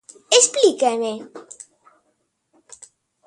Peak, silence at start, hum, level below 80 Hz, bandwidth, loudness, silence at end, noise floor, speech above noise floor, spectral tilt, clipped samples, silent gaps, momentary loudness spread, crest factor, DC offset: 0 dBFS; 0.3 s; none; -76 dBFS; 11.5 kHz; -17 LUFS; 1.85 s; -70 dBFS; 52 dB; -0.5 dB/octave; under 0.1%; none; 25 LU; 22 dB; under 0.1%